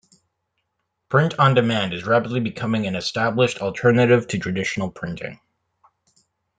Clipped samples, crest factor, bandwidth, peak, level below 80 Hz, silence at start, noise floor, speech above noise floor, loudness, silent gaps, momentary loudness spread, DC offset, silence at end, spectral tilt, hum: under 0.1%; 18 dB; 9.4 kHz; -4 dBFS; -58 dBFS; 1.1 s; -76 dBFS; 56 dB; -20 LUFS; none; 11 LU; under 0.1%; 1.25 s; -6 dB/octave; none